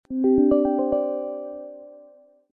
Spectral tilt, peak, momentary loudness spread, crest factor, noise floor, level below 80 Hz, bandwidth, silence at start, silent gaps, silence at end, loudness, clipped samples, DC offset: -12 dB/octave; -8 dBFS; 20 LU; 16 dB; -52 dBFS; -52 dBFS; 3.1 kHz; 0.1 s; none; 0.5 s; -22 LUFS; under 0.1%; under 0.1%